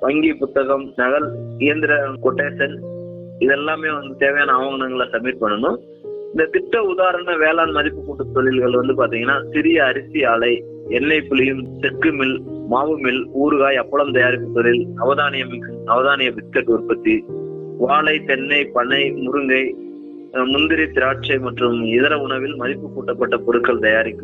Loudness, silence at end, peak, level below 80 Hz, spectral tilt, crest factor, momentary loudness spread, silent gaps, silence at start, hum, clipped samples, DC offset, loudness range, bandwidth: -18 LUFS; 0 s; -2 dBFS; -52 dBFS; -7.5 dB/octave; 16 dB; 9 LU; none; 0 s; none; under 0.1%; under 0.1%; 2 LU; 4.3 kHz